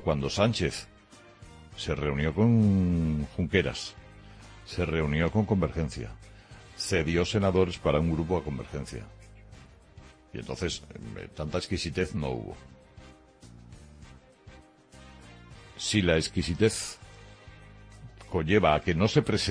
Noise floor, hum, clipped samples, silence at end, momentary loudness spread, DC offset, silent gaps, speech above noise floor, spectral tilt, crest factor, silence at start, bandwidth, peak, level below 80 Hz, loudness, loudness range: -53 dBFS; none; under 0.1%; 0 s; 24 LU; under 0.1%; none; 26 dB; -5.5 dB/octave; 22 dB; 0 s; 10.5 kHz; -8 dBFS; -44 dBFS; -28 LUFS; 9 LU